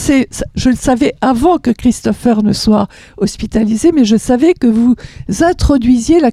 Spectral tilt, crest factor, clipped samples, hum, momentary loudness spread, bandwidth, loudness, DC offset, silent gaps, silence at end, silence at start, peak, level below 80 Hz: -5.5 dB/octave; 10 dB; under 0.1%; none; 8 LU; 14 kHz; -12 LUFS; under 0.1%; none; 0 s; 0 s; 0 dBFS; -28 dBFS